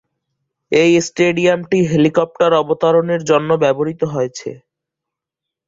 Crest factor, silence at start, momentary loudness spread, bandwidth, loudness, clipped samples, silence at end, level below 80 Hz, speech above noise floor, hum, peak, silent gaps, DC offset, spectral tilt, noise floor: 16 dB; 0.7 s; 6 LU; 7.8 kHz; -15 LUFS; under 0.1%; 1.1 s; -56 dBFS; 69 dB; none; -2 dBFS; none; under 0.1%; -5.5 dB/octave; -83 dBFS